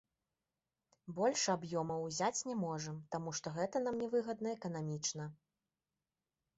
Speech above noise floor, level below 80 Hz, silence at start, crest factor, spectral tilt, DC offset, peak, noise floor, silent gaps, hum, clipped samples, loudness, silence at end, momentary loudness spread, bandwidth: over 51 dB; -76 dBFS; 1.05 s; 18 dB; -4.5 dB/octave; under 0.1%; -22 dBFS; under -90 dBFS; none; none; under 0.1%; -39 LUFS; 1.25 s; 8 LU; 8 kHz